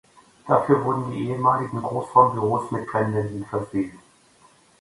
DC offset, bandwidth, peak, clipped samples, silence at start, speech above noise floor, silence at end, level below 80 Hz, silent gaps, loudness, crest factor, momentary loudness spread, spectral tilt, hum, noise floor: under 0.1%; 11.5 kHz; -2 dBFS; under 0.1%; 0.45 s; 34 dB; 0.85 s; -58 dBFS; none; -23 LUFS; 22 dB; 10 LU; -8.5 dB/octave; none; -56 dBFS